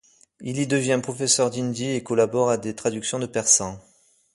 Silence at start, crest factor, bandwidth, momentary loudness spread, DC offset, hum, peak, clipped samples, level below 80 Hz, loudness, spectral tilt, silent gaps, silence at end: 0.4 s; 20 dB; 11.5 kHz; 9 LU; under 0.1%; none; -4 dBFS; under 0.1%; -60 dBFS; -22 LUFS; -3.5 dB/octave; none; 0.55 s